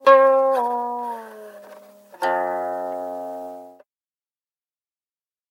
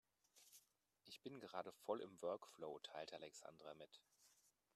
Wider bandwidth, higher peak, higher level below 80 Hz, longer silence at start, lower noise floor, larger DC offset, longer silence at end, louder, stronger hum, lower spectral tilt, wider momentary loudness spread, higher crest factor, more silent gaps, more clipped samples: first, 15.5 kHz vs 13.5 kHz; first, -2 dBFS vs -32 dBFS; first, -84 dBFS vs under -90 dBFS; second, 0.05 s vs 0.35 s; first, under -90 dBFS vs -79 dBFS; neither; first, 1.8 s vs 0.25 s; first, -21 LUFS vs -54 LUFS; neither; about the same, -4 dB/octave vs -4 dB/octave; first, 25 LU vs 17 LU; about the same, 22 dB vs 24 dB; neither; neither